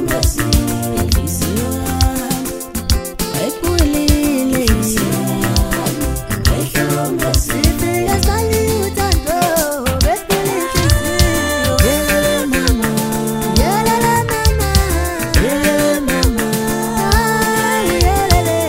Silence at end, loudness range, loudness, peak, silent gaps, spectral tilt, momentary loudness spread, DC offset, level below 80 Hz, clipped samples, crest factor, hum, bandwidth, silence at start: 0 s; 2 LU; -15 LUFS; 0 dBFS; none; -4.5 dB/octave; 5 LU; under 0.1%; -22 dBFS; under 0.1%; 14 dB; none; 16.5 kHz; 0 s